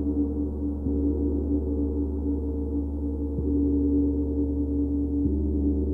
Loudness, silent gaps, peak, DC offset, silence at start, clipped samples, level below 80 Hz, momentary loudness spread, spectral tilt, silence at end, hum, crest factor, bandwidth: -27 LUFS; none; -14 dBFS; under 0.1%; 0 s; under 0.1%; -30 dBFS; 5 LU; -14 dB/octave; 0 s; none; 10 dB; 1.4 kHz